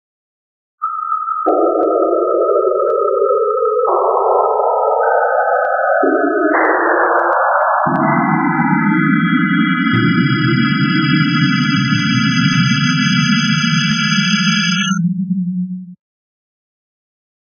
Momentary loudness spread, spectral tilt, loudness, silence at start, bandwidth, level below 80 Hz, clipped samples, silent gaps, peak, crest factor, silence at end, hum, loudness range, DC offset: 4 LU; -5.5 dB/octave; -14 LUFS; 0.8 s; 6.6 kHz; -56 dBFS; under 0.1%; none; -2 dBFS; 14 dB; 1.65 s; none; 2 LU; under 0.1%